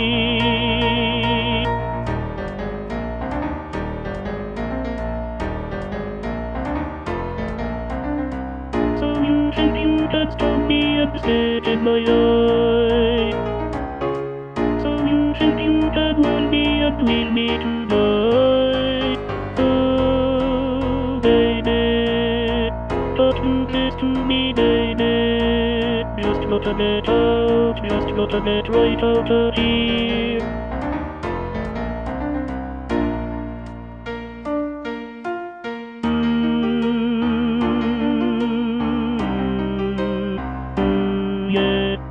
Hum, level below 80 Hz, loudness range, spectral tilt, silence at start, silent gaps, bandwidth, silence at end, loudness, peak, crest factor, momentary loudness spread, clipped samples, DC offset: none; -32 dBFS; 8 LU; -7.5 dB/octave; 0 s; none; 7.2 kHz; 0 s; -20 LUFS; -4 dBFS; 16 dB; 10 LU; under 0.1%; under 0.1%